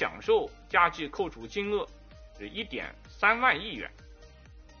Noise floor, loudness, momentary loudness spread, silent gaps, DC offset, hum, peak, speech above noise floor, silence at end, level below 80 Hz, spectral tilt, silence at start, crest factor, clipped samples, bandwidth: -52 dBFS; -28 LUFS; 16 LU; none; under 0.1%; none; -8 dBFS; 22 dB; 0.05 s; -52 dBFS; -1 dB/octave; 0 s; 22 dB; under 0.1%; 6.8 kHz